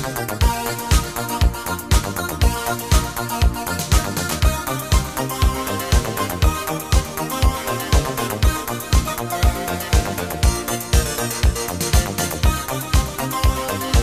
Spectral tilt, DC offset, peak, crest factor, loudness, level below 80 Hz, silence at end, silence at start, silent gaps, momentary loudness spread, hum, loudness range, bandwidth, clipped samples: -4 dB/octave; 0.3%; -2 dBFS; 16 dB; -20 LUFS; -22 dBFS; 0 s; 0 s; none; 5 LU; none; 0 LU; 16 kHz; under 0.1%